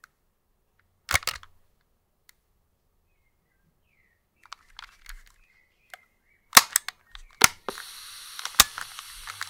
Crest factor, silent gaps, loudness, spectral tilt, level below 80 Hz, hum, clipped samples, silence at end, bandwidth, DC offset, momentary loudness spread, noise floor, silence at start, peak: 30 dB; none; -21 LUFS; 0.5 dB/octave; -52 dBFS; none; under 0.1%; 0.2 s; 18 kHz; under 0.1%; 25 LU; -71 dBFS; 1.1 s; 0 dBFS